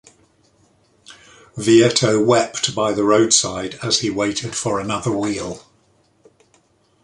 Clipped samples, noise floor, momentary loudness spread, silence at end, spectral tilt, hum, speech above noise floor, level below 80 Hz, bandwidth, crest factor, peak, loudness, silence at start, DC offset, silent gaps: under 0.1%; -59 dBFS; 12 LU; 1.45 s; -3.5 dB/octave; none; 41 dB; -54 dBFS; 11.5 kHz; 18 dB; -2 dBFS; -17 LUFS; 1.1 s; under 0.1%; none